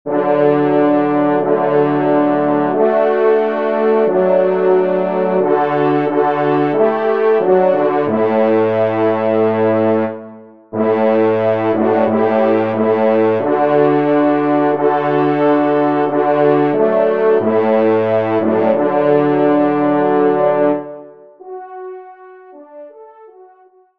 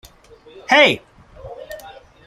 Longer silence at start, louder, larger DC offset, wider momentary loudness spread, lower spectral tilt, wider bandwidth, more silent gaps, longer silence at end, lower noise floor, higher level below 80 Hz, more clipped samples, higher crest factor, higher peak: second, 0.05 s vs 0.7 s; about the same, -14 LUFS vs -14 LUFS; first, 0.5% vs under 0.1%; second, 3 LU vs 25 LU; first, -9.5 dB/octave vs -3 dB/octave; second, 5.2 kHz vs 15.5 kHz; neither; first, 0.55 s vs 0.35 s; about the same, -48 dBFS vs -46 dBFS; second, -66 dBFS vs -52 dBFS; neither; second, 12 dB vs 20 dB; about the same, -2 dBFS vs 0 dBFS